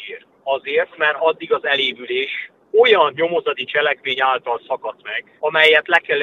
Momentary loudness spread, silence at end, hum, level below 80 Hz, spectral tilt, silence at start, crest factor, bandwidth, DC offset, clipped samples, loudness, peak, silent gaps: 14 LU; 0 s; none; -70 dBFS; -3.5 dB/octave; 0 s; 18 dB; 8.4 kHz; under 0.1%; under 0.1%; -17 LUFS; 0 dBFS; none